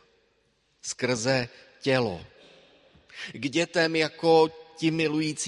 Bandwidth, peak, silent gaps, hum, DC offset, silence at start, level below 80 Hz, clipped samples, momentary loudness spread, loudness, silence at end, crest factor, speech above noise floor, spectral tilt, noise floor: 11.5 kHz; -8 dBFS; none; none; under 0.1%; 0.85 s; -64 dBFS; under 0.1%; 18 LU; -26 LUFS; 0 s; 20 dB; 43 dB; -4.5 dB/octave; -69 dBFS